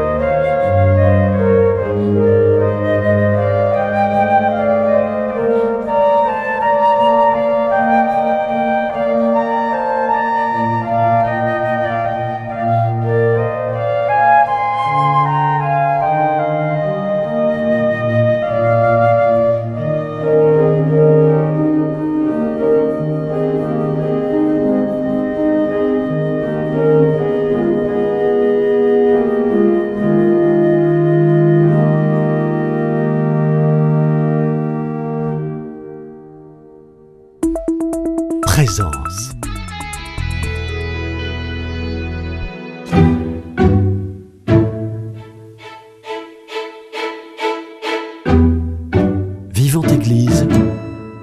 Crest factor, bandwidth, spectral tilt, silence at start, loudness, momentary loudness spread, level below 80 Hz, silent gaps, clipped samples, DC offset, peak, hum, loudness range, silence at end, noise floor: 14 dB; 13.5 kHz; -7.5 dB/octave; 0 s; -15 LUFS; 11 LU; -34 dBFS; none; under 0.1%; under 0.1%; 0 dBFS; none; 7 LU; 0 s; -43 dBFS